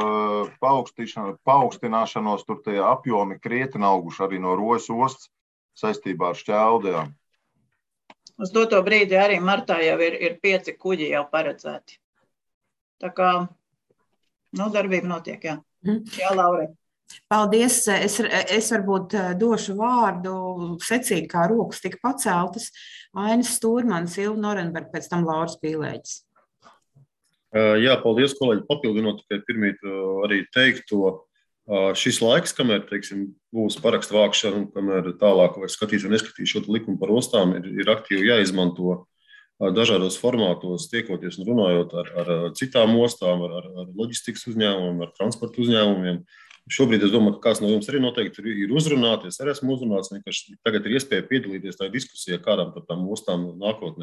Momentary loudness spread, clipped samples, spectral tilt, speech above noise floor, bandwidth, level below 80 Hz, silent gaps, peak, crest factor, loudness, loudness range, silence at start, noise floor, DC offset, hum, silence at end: 11 LU; under 0.1%; -4 dB/octave; 53 dB; 13 kHz; -66 dBFS; 5.41-5.69 s, 12.04-12.13 s, 12.54-12.61 s, 12.81-12.98 s; -4 dBFS; 18 dB; -22 LUFS; 5 LU; 0 s; -75 dBFS; under 0.1%; none; 0 s